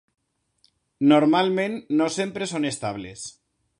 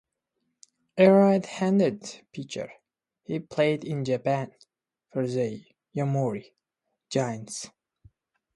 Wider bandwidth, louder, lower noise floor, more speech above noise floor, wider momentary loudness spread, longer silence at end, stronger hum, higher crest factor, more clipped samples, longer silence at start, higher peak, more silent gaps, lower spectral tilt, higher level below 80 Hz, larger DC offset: about the same, 11 kHz vs 11.5 kHz; first, -22 LUFS vs -26 LUFS; second, -66 dBFS vs -82 dBFS; second, 44 dB vs 57 dB; second, 17 LU vs 20 LU; second, 0.5 s vs 0.9 s; neither; about the same, 20 dB vs 22 dB; neither; about the same, 1 s vs 0.95 s; about the same, -4 dBFS vs -6 dBFS; neither; second, -5 dB/octave vs -6.5 dB/octave; first, -64 dBFS vs -70 dBFS; neither